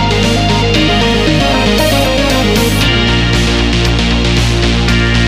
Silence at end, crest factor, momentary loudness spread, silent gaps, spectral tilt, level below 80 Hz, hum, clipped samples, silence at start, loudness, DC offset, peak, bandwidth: 0 s; 10 dB; 1 LU; none; -5 dB/octave; -18 dBFS; none; under 0.1%; 0 s; -10 LUFS; under 0.1%; 0 dBFS; 16 kHz